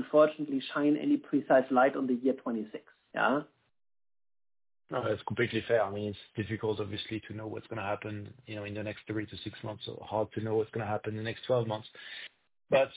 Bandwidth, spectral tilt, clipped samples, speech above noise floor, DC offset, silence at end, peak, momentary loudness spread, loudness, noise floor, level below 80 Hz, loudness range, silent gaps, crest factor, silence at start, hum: 4 kHz; -5 dB/octave; under 0.1%; over 59 dB; under 0.1%; 0 s; -12 dBFS; 15 LU; -32 LUFS; under -90 dBFS; -64 dBFS; 8 LU; none; 20 dB; 0 s; none